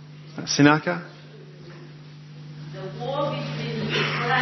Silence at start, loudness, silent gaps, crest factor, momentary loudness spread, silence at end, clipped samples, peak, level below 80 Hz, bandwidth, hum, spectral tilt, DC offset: 0 s; -24 LUFS; none; 26 dB; 25 LU; 0 s; under 0.1%; 0 dBFS; -64 dBFS; 6.2 kHz; none; -4.5 dB/octave; under 0.1%